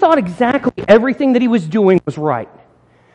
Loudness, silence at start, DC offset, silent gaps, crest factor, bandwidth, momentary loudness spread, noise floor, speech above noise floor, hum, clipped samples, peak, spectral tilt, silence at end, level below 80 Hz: -14 LUFS; 0 s; under 0.1%; none; 14 dB; 9.4 kHz; 8 LU; -50 dBFS; 37 dB; none; under 0.1%; 0 dBFS; -7.5 dB/octave; 0.7 s; -50 dBFS